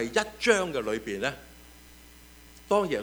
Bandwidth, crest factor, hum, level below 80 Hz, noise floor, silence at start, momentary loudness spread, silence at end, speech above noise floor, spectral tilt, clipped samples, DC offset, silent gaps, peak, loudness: over 20 kHz; 22 dB; 60 Hz at -55 dBFS; -54 dBFS; -52 dBFS; 0 s; 12 LU; 0 s; 24 dB; -3.5 dB/octave; under 0.1%; under 0.1%; none; -6 dBFS; -28 LUFS